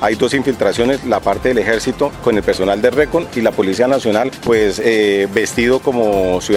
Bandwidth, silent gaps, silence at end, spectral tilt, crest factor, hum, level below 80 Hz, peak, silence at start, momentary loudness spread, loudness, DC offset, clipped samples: 16 kHz; none; 0 s; -4.5 dB/octave; 14 dB; none; -38 dBFS; 0 dBFS; 0 s; 3 LU; -15 LUFS; under 0.1%; under 0.1%